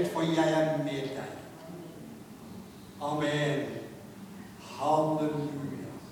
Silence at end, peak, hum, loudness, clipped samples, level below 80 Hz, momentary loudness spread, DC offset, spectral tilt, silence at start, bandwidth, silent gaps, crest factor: 0 s; -14 dBFS; none; -31 LUFS; under 0.1%; -66 dBFS; 20 LU; under 0.1%; -6 dB/octave; 0 s; 19 kHz; none; 18 dB